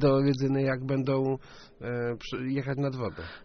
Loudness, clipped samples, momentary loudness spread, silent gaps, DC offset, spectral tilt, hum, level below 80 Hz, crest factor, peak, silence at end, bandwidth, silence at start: -29 LUFS; under 0.1%; 10 LU; none; under 0.1%; -7 dB/octave; none; -54 dBFS; 16 dB; -12 dBFS; 0.05 s; 6.4 kHz; 0 s